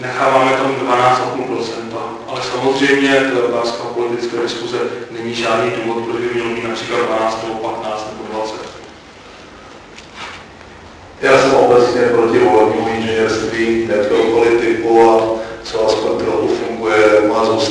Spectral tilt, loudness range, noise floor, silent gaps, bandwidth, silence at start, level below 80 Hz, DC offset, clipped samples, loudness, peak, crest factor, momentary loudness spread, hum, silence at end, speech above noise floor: -4.5 dB/octave; 9 LU; -37 dBFS; none; 10.5 kHz; 0 s; -48 dBFS; under 0.1%; under 0.1%; -15 LUFS; -2 dBFS; 14 dB; 14 LU; none; 0 s; 23 dB